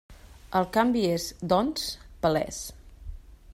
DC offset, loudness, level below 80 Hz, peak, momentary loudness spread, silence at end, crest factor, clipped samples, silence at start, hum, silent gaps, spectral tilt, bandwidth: under 0.1%; -27 LUFS; -48 dBFS; -8 dBFS; 22 LU; 0 s; 20 dB; under 0.1%; 0.1 s; none; none; -5 dB/octave; 16 kHz